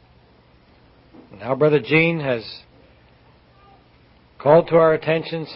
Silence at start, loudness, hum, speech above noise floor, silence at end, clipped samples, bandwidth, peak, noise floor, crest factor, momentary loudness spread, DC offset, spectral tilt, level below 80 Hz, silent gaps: 1.35 s; -18 LUFS; none; 35 dB; 0 s; under 0.1%; 5.8 kHz; 0 dBFS; -53 dBFS; 20 dB; 16 LU; under 0.1%; -11 dB/octave; -56 dBFS; none